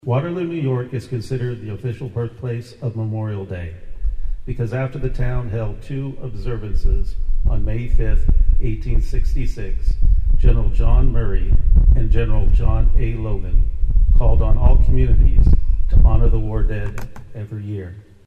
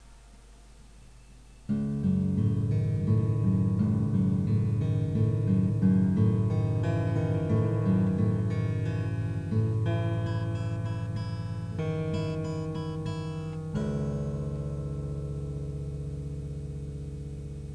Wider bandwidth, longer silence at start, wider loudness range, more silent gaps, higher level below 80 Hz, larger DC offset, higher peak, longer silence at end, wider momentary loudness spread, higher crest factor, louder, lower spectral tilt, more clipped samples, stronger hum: second, 5.2 kHz vs 9 kHz; about the same, 0.05 s vs 0 s; about the same, 8 LU vs 8 LU; neither; first, -16 dBFS vs -46 dBFS; neither; first, 0 dBFS vs -12 dBFS; first, 0.25 s vs 0 s; about the same, 12 LU vs 11 LU; about the same, 14 dB vs 16 dB; first, -21 LUFS vs -29 LUFS; about the same, -9 dB/octave vs -9 dB/octave; neither; neither